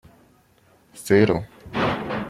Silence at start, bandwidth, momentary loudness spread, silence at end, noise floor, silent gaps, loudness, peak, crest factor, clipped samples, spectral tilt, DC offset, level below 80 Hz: 0.95 s; 15.5 kHz; 13 LU; 0 s; -58 dBFS; none; -22 LUFS; -4 dBFS; 20 dB; under 0.1%; -6 dB/octave; under 0.1%; -52 dBFS